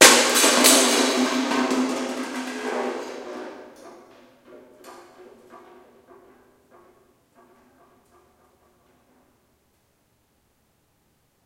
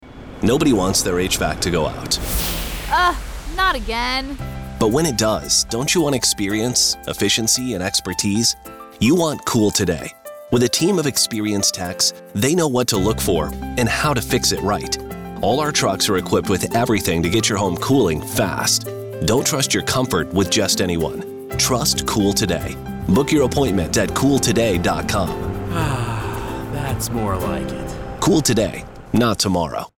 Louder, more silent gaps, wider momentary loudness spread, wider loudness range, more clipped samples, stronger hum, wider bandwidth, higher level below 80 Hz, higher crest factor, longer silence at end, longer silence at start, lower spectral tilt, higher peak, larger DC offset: about the same, -19 LUFS vs -19 LUFS; neither; first, 22 LU vs 9 LU; first, 26 LU vs 3 LU; neither; neither; second, 16 kHz vs over 20 kHz; second, -70 dBFS vs -36 dBFS; first, 24 dB vs 12 dB; first, 5.9 s vs 0.1 s; about the same, 0 s vs 0 s; second, 0 dB/octave vs -3.5 dB/octave; first, 0 dBFS vs -6 dBFS; neither